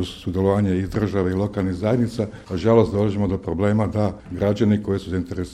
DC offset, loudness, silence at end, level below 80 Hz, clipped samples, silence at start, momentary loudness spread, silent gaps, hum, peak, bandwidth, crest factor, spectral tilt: under 0.1%; -22 LUFS; 0 s; -42 dBFS; under 0.1%; 0 s; 8 LU; none; none; -2 dBFS; 11 kHz; 18 dB; -8 dB/octave